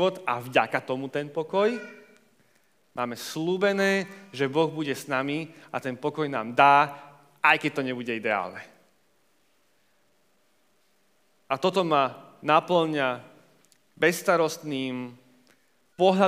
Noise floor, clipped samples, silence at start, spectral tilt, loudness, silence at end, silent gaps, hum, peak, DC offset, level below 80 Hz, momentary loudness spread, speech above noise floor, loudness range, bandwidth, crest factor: -68 dBFS; under 0.1%; 0 s; -5 dB/octave; -26 LUFS; 0 s; none; none; -4 dBFS; under 0.1%; -84 dBFS; 13 LU; 43 dB; 7 LU; 15.5 kHz; 24 dB